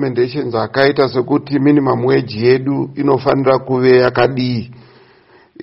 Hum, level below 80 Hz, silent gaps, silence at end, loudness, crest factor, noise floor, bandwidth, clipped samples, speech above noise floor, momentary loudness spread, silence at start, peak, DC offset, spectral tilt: none; -50 dBFS; none; 0 s; -14 LUFS; 14 dB; -48 dBFS; 5.8 kHz; under 0.1%; 34 dB; 8 LU; 0 s; 0 dBFS; under 0.1%; -9.5 dB/octave